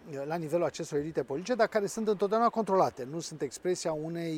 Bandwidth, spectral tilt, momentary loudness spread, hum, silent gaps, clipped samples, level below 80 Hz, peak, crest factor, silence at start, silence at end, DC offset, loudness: 16.5 kHz; -5 dB/octave; 9 LU; none; none; under 0.1%; -68 dBFS; -12 dBFS; 20 dB; 0.05 s; 0 s; under 0.1%; -31 LUFS